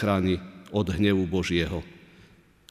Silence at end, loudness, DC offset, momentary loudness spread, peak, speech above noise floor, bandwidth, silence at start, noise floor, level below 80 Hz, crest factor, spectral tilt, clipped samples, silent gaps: 0.8 s; -27 LUFS; under 0.1%; 9 LU; -10 dBFS; 30 dB; 14.5 kHz; 0 s; -56 dBFS; -46 dBFS; 18 dB; -6.5 dB/octave; under 0.1%; none